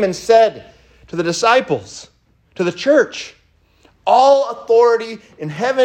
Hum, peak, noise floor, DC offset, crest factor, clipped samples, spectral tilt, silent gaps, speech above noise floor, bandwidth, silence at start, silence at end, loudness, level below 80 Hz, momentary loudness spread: none; 0 dBFS; -54 dBFS; under 0.1%; 16 dB; under 0.1%; -4 dB/octave; none; 39 dB; 10 kHz; 0 s; 0 s; -15 LUFS; -56 dBFS; 17 LU